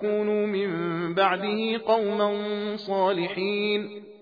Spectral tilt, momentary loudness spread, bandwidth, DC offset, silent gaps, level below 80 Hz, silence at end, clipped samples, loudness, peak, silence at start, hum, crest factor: -7.5 dB/octave; 6 LU; 5 kHz; under 0.1%; none; -76 dBFS; 0.05 s; under 0.1%; -26 LUFS; -8 dBFS; 0 s; none; 18 dB